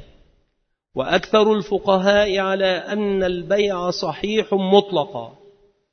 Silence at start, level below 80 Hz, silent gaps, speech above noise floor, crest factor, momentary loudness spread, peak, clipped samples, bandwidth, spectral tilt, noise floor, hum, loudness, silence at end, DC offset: 0 s; -50 dBFS; none; 52 dB; 20 dB; 9 LU; 0 dBFS; under 0.1%; 6.6 kHz; -5.5 dB/octave; -71 dBFS; none; -19 LUFS; 0.6 s; under 0.1%